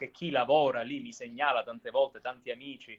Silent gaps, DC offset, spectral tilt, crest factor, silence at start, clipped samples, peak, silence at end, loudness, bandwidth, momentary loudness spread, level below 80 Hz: none; under 0.1%; -5 dB/octave; 18 dB; 0 s; under 0.1%; -12 dBFS; 0.05 s; -31 LUFS; 7.8 kHz; 14 LU; -76 dBFS